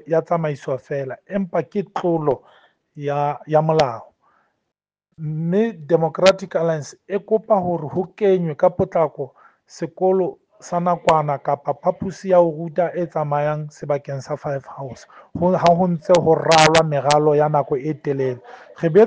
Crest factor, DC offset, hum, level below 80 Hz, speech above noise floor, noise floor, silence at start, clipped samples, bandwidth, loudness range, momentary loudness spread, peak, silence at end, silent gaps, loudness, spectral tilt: 18 dB; under 0.1%; none; -56 dBFS; 62 dB; -81 dBFS; 0.05 s; under 0.1%; 9.8 kHz; 6 LU; 12 LU; 0 dBFS; 0 s; none; -20 LUFS; -6 dB/octave